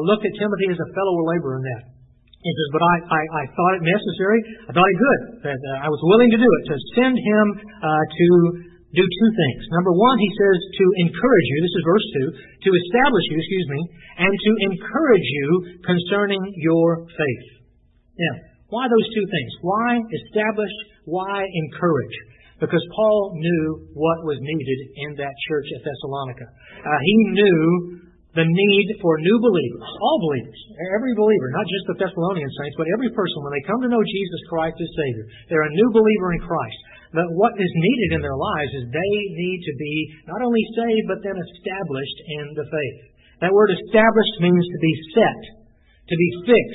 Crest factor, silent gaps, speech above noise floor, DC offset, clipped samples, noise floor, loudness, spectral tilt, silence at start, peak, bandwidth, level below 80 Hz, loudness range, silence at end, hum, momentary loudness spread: 18 dB; none; 37 dB; under 0.1%; under 0.1%; -56 dBFS; -20 LUFS; -11.5 dB/octave; 0 s; -2 dBFS; 4 kHz; -52 dBFS; 6 LU; 0 s; none; 12 LU